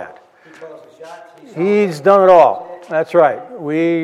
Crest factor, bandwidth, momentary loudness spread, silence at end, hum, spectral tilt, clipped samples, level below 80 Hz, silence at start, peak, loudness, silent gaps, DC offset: 14 dB; 12 kHz; 17 LU; 0 s; none; -7 dB/octave; under 0.1%; -66 dBFS; 0 s; 0 dBFS; -13 LUFS; none; under 0.1%